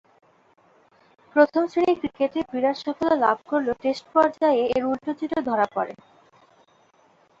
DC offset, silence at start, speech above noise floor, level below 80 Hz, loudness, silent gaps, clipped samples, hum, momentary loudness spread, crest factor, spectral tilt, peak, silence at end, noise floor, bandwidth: under 0.1%; 1.35 s; 37 dB; -64 dBFS; -23 LUFS; none; under 0.1%; none; 7 LU; 22 dB; -6 dB/octave; -4 dBFS; 1.5 s; -59 dBFS; 7.6 kHz